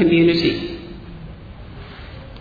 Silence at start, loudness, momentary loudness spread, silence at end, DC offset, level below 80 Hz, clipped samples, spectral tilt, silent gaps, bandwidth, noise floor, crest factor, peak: 0 s; -18 LUFS; 23 LU; 0 s; under 0.1%; -40 dBFS; under 0.1%; -7.5 dB/octave; none; 5 kHz; -36 dBFS; 18 dB; -4 dBFS